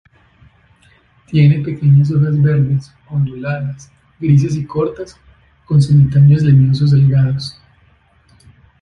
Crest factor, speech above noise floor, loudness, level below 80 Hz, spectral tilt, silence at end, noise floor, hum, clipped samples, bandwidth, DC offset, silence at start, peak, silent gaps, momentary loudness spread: 12 dB; 40 dB; -13 LUFS; -44 dBFS; -8.5 dB/octave; 1.3 s; -52 dBFS; none; under 0.1%; 6.6 kHz; under 0.1%; 1.3 s; -2 dBFS; none; 13 LU